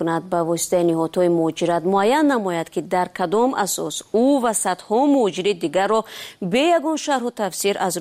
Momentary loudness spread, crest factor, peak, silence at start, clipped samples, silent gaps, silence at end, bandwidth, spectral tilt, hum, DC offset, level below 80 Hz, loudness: 6 LU; 12 dB; -8 dBFS; 0 s; under 0.1%; none; 0 s; 15.5 kHz; -4 dB/octave; none; under 0.1%; -64 dBFS; -20 LUFS